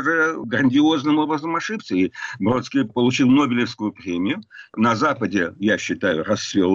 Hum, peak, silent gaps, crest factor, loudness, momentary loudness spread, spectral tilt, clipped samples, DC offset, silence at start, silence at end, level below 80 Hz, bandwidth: none; -8 dBFS; none; 12 dB; -20 LUFS; 8 LU; -5.5 dB/octave; under 0.1%; under 0.1%; 0 s; 0 s; -58 dBFS; 7.6 kHz